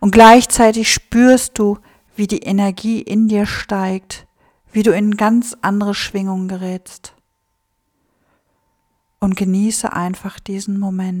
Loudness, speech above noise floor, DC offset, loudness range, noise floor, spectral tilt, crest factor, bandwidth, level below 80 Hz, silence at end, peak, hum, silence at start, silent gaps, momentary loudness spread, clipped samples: -15 LUFS; 54 dB; under 0.1%; 10 LU; -68 dBFS; -4.5 dB/octave; 16 dB; 18 kHz; -42 dBFS; 0 s; 0 dBFS; none; 0 s; none; 15 LU; 0.6%